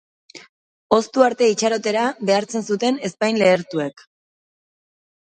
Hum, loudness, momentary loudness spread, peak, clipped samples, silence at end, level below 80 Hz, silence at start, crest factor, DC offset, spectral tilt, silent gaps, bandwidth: none; -19 LUFS; 8 LU; 0 dBFS; under 0.1%; 1.3 s; -64 dBFS; 0.35 s; 20 dB; under 0.1%; -4 dB/octave; 0.49-0.90 s; 9.6 kHz